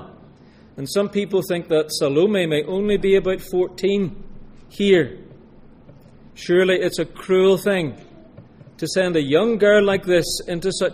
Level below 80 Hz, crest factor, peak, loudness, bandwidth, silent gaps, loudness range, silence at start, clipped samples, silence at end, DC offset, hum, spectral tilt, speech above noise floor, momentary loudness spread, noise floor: -44 dBFS; 18 dB; -2 dBFS; -19 LUFS; 15.5 kHz; none; 3 LU; 0 s; under 0.1%; 0 s; under 0.1%; none; -5 dB/octave; 29 dB; 8 LU; -47 dBFS